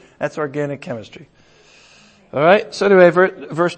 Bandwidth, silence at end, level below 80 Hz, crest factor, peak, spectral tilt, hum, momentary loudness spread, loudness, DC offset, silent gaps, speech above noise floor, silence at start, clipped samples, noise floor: 8.8 kHz; 0 s; -62 dBFS; 18 dB; 0 dBFS; -6 dB/octave; none; 17 LU; -15 LUFS; under 0.1%; none; 34 dB; 0.2 s; under 0.1%; -49 dBFS